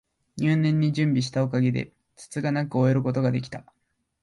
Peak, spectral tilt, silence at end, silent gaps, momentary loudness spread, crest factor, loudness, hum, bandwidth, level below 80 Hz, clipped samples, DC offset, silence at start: -10 dBFS; -7.5 dB/octave; 0.6 s; none; 15 LU; 14 dB; -24 LUFS; none; 11.5 kHz; -62 dBFS; under 0.1%; under 0.1%; 0.35 s